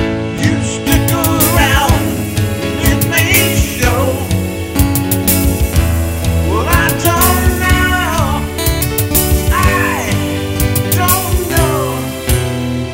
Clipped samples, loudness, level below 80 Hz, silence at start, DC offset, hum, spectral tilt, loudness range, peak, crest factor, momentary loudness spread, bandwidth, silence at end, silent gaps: under 0.1%; -13 LUFS; -20 dBFS; 0 s; under 0.1%; none; -4.5 dB/octave; 2 LU; 0 dBFS; 12 dB; 6 LU; 17 kHz; 0 s; none